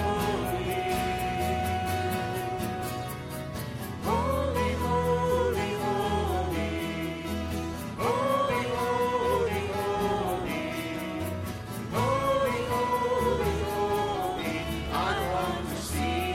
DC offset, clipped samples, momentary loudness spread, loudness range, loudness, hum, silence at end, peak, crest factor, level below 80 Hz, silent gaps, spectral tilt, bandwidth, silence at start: under 0.1%; under 0.1%; 7 LU; 3 LU; -29 LUFS; none; 0 s; -14 dBFS; 14 dB; -42 dBFS; none; -5.5 dB/octave; 16.5 kHz; 0 s